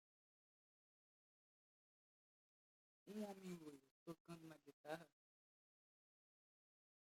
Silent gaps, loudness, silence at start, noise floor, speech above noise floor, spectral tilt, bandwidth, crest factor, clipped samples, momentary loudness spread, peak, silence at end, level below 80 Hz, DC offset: 3.91-4.06 s, 4.20-4.25 s, 4.73-4.84 s; -57 LUFS; 3.05 s; under -90 dBFS; over 34 dB; -6 dB/octave; 16 kHz; 26 dB; under 0.1%; 10 LU; -36 dBFS; 2 s; under -90 dBFS; under 0.1%